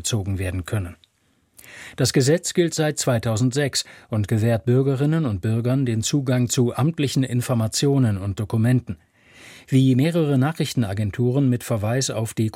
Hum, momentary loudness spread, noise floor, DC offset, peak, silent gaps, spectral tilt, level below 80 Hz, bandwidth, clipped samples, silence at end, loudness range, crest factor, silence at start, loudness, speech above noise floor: none; 7 LU; -64 dBFS; under 0.1%; -6 dBFS; none; -5.5 dB/octave; -52 dBFS; 16 kHz; under 0.1%; 0.05 s; 1 LU; 14 dB; 0 s; -21 LUFS; 44 dB